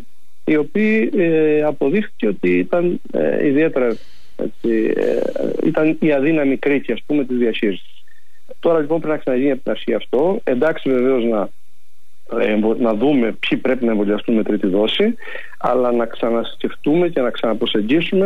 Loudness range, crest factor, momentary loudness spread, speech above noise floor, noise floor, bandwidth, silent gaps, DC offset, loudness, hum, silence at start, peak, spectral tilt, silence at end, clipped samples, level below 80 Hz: 2 LU; 12 dB; 6 LU; 45 dB; -62 dBFS; 11 kHz; none; 5%; -18 LUFS; none; 0.45 s; -6 dBFS; -7.5 dB/octave; 0 s; under 0.1%; -60 dBFS